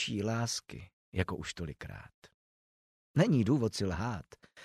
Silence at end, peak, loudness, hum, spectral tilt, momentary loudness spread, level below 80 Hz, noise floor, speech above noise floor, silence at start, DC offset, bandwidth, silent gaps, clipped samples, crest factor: 0 s; -12 dBFS; -33 LUFS; none; -5.5 dB/octave; 19 LU; -56 dBFS; under -90 dBFS; over 57 dB; 0 s; under 0.1%; 14 kHz; 0.93-1.12 s, 2.14-2.22 s, 2.34-3.14 s; under 0.1%; 22 dB